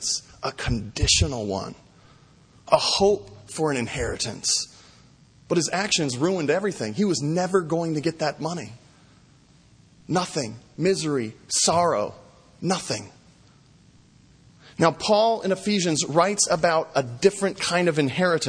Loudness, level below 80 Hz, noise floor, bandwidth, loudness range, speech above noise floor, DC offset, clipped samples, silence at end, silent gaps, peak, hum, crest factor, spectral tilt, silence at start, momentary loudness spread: -23 LUFS; -44 dBFS; -55 dBFS; 10.5 kHz; 6 LU; 32 dB; under 0.1%; under 0.1%; 0 s; none; -2 dBFS; none; 22 dB; -3.5 dB/octave; 0 s; 11 LU